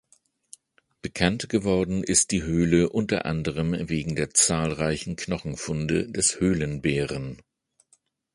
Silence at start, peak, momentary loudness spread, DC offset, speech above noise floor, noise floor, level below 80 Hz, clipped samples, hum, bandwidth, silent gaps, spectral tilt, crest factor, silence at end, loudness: 1.05 s; -2 dBFS; 10 LU; under 0.1%; 41 dB; -66 dBFS; -46 dBFS; under 0.1%; none; 11.5 kHz; none; -4 dB/octave; 24 dB; 1 s; -24 LUFS